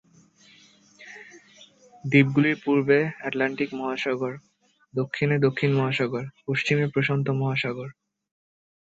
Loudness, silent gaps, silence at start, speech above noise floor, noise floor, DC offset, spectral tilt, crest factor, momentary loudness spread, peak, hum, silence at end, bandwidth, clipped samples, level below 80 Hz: -24 LUFS; none; 1 s; 33 dB; -56 dBFS; under 0.1%; -7 dB/octave; 20 dB; 17 LU; -6 dBFS; none; 1 s; 7.8 kHz; under 0.1%; -64 dBFS